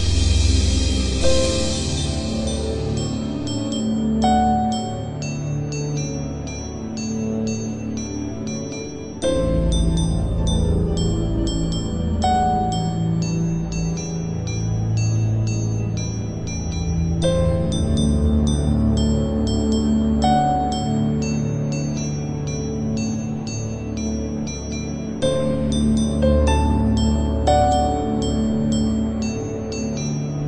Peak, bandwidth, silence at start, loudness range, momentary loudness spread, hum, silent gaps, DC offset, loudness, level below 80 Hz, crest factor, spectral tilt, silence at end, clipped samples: -4 dBFS; 11 kHz; 0 s; 6 LU; 9 LU; none; none; under 0.1%; -21 LUFS; -28 dBFS; 16 dB; -6 dB/octave; 0 s; under 0.1%